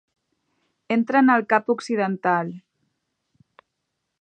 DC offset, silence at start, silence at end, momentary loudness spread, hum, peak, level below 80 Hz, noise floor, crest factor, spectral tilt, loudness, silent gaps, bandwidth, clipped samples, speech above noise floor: under 0.1%; 0.9 s; 1.6 s; 8 LU; none; -4 dBFS; -76 dBFS; -79 dBFS; 22 dB; -6.5 dB/octave; -21 LUFS; none; 9.2 kHz; under 0.1%; 58 dB